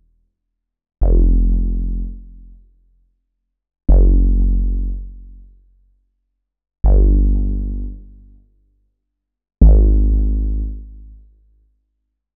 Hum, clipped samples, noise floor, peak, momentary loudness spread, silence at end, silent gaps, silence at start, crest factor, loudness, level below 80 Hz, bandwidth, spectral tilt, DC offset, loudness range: none; under 0.1%; -77 dBFS; 0 dBFS; 18 LU; 1.35 s; none; 1 s; 16 dB; -18 LUFS; -16 dBFS; 1.1 kHz; -15.5 dB/octave; under 0.1%; 3 LU